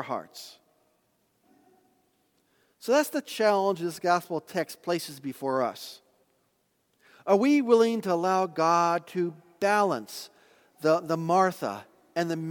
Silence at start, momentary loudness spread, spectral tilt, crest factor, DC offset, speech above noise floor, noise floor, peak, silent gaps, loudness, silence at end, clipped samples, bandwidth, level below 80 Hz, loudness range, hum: 0 s; 17 LU; -5 dB/octave; 20 dB; under 0.1%; 46 dB; -72 dBFS; -8 dBFS; none; -27 LUFS; 0 s; under 0.1%; 19 kHz; -82 dBFS; 7 LU; none